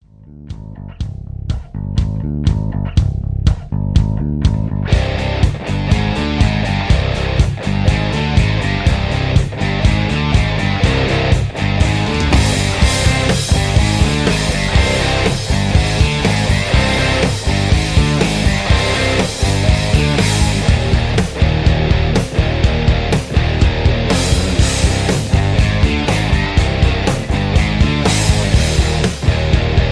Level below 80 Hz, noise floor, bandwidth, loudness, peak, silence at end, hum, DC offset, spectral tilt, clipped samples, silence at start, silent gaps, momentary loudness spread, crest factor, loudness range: -20 dBFS; -37 dBFS; 11 kHz; -15 LUFS; 0 dBFS; 0 s; none; under 0.1%; -5 dB/octave; under 0.1%; 0.25 s; none; 4 LU; 14 dB; 3 LU